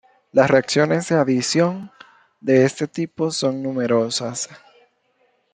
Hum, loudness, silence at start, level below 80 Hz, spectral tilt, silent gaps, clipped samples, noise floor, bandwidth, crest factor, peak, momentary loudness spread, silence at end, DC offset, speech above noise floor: none; -20 LUFS; 0.35 s; -64 dBFS; -5 dB/octave; none; under 0.1%; -64 dBFS; 9.6 kHz; 18 dB; -2 dBFS; 13 LU; 0.95 s; under 0.1%; 45 dB